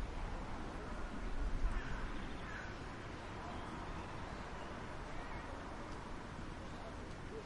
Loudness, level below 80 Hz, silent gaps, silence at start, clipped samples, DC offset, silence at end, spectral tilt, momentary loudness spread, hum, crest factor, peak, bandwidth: -47 LUFS; -46 dBFS; none; 0 s; under 0.1%; under 0.1%; 0 s; -5.5 dB/octave; 5 LU; none; 18 dB; -26 dBFS; 11 kHz